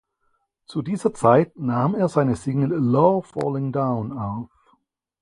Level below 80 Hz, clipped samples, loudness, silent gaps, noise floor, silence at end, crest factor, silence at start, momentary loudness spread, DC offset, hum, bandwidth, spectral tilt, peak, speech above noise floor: -56 dBFS; under 0.1%; -22 LUFS; none; -70 dBFS; 0.75 s; 20 dB; 0.7 s; 13 LU; under 0.1%; none; 11 kHz; -8.5 dB/octave; -2 dBFS; 49 dB